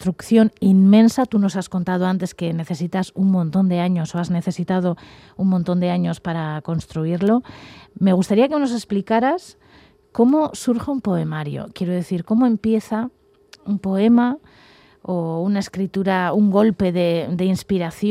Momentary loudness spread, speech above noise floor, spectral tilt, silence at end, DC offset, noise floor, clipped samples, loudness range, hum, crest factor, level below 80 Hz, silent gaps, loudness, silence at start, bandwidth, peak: 10 LU; 32 dB; -7.5 dB/octave; 0 s; under 0.1%; -51 dBFS; under 0.1%; 4 LU; none; 16 dB; -54 dBFS; none; -19 LUFS; 0 s; 12.5 kHz; -4 dBFS